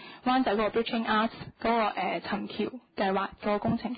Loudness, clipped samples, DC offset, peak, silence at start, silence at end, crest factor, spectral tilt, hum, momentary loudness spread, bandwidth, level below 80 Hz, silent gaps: -29 LUFS; under 0.1%; under 0.1%; -14 dBFS; 0 s; 0 s; 14 dB; -9.5 dB/octave; none; 7 LU; 5 kHz; -58 dBFS; none